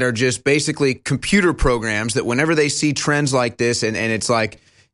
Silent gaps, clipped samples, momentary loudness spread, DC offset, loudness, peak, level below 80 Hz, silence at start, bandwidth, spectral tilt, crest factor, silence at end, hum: none; under 0.1%; 4 LU; under 0.1%; -18 LUFS; -2 dBFS; -34 dBFS; 0 s; 11.5 kHz; -4.5 dB/octave; 16 dB; 0.45 s; none